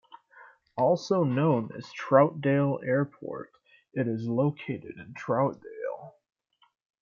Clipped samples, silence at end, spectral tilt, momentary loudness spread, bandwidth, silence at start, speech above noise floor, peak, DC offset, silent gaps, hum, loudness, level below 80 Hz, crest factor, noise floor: under 0.1%; 0.9 s; -8 dB/octave; 16 LU; 7.2 kHz; 0.35 s; 28 dB; -6 dBFS; under 0.1%; none; none; -28 LUFS; -72 dBFS; 22 dB; -55 dBFS